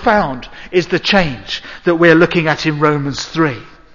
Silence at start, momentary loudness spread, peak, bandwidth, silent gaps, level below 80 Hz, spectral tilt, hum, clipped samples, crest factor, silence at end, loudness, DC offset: 0 s; 13 LU; 0 dBFS; 7.4 kHz; none; -38 dBFS; -5.5 dB/octave; none; under 0.1%; 14 dB; 0.25 s; -14 LUFS; under 0.1%